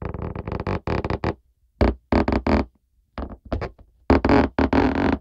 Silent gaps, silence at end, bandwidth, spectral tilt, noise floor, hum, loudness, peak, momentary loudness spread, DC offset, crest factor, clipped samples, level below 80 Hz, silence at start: none; 0 s; 7.8 kHz; -8.5 dB/octave; -61 dBFS; none; -23 LUFS; -4 dBFS; 17 LU; under 0.1%; 18 dB; under 0.1%; -32 dBFS; 0 s